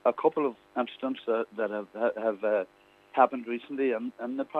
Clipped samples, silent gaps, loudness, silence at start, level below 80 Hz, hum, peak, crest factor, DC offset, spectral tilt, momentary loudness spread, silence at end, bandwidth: under 0.1%; none; -30 LUFS; 0.05 s; -80 dBFS; none; -8 dBFS; 22 dB; under 0.1%; -7 dB/octave; 9 LU; 0 s; 5 kHz